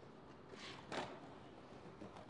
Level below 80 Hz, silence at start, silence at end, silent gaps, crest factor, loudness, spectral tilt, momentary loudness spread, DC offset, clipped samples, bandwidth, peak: -76 dBFS; 0 s; 0 s; none; 22 dB; -53 LUFS; -4.5 dB/octave; 11 LU; under 0.1%; under 0.1%; 11 kHz; -32 dBFS